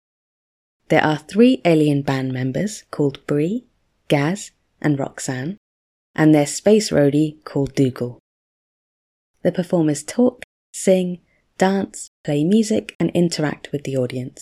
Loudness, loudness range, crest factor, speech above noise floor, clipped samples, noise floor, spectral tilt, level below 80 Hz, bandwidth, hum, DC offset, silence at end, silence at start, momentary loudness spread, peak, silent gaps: -20 LUFS; 4 LU; 20 dB; over 71 dB; under 0.1%; under -90 dBFS; -6 dB/octave; -56 dBFS; 14.5 kHz; none; under 0.1%; 0.15 s; 0.9 s; 13 LU; 0 dBFS; 5.57-6.14 s, 8.20-9.34 s, 10.44-10.73 s, 12.07-12.24 s, 12.95-13.00 s